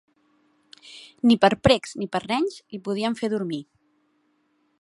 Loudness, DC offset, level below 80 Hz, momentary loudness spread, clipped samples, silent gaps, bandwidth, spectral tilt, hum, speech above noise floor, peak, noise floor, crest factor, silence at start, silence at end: -23 LUFS; under 0.1%; -50 dBFS; 18 LU; under 0.1%; none; 11.5 kHz; -5.5 dB/octave; none; 45 dB; -2 dBFS; -68 dBFS; 22 dB; 0.85 s; 1.2 s